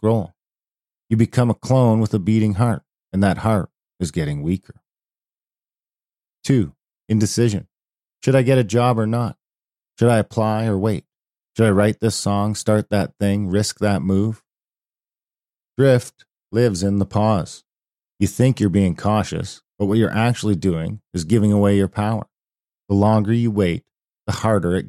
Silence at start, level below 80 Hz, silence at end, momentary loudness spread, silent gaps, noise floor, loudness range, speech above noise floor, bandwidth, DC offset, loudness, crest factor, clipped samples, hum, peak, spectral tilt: 0 s; -48 dBFS; 0 s; 11 LU; none; under -90 dBFS; 5 LU; over 72 dB; 13.5 kHz; under 0.1%; -19 LUFS; 16 dB; under 0.1%; none; -4 dBFS; -7 dB/octave